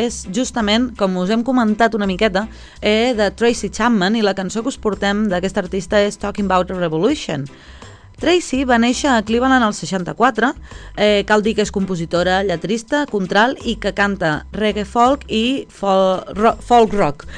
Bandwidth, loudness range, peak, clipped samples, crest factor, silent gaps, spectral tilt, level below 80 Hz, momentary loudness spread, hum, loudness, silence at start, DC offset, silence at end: 10.5 kHz; 2 LU; 0 dBFS; under 0.1%; 16 dB; none; -4.5 dB/octave; -38 dBFS; 7 LU; none; -17 LUFS; 0 s; under 0.1%; 0 s